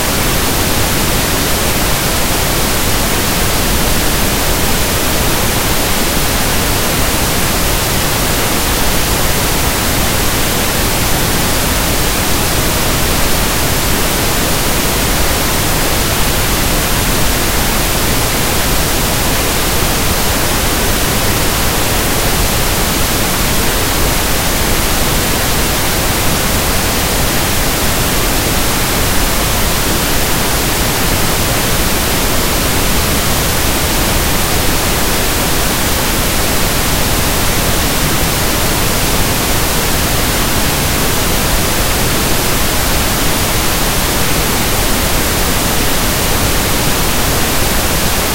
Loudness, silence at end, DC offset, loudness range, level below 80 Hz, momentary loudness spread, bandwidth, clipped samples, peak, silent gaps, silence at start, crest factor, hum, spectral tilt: -12 LUFS; 0 s; under 0.1%; 0 LU; -20 dBFS; 0 LU; 16 kHz; under 0.1%; 0 dBFS; none; 0 s; 12 dB; none; -3 dB/octave